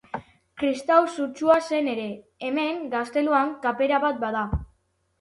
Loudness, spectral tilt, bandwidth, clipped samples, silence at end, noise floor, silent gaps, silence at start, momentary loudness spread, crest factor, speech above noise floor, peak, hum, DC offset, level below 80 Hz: -24 LUFS; -6 dB/octave; 11.5 kHz; under 0.1%; 0.55 s; -68 dBFS; none; 0.15 s; 12 LU; 18 dB; 45 dB; -6 dBFS; none; under 0.1%; -44 dBFS